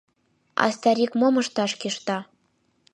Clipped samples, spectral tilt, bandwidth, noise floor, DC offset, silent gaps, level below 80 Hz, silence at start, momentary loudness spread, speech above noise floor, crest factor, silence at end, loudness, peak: under 0.1%; -4 dB/octave; 11.5 kHz; -68 dBFS; under 0.1%; none; -76 dBFS; 0.55 s; 9 LU; 45 dB; 22 dB; 0.7 s; -24 LUFS; -4 dBFS